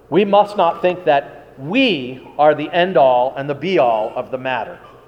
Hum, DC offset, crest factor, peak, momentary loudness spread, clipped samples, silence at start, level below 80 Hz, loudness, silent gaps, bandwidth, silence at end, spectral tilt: none; under 0.1%; 16 dB; -2 dBFS; 10 LU; under 0.1%; 0.1 s; -58 dBFS; -16 LUFS; none; 9 kHz; 0.2 s; -7 dB/octave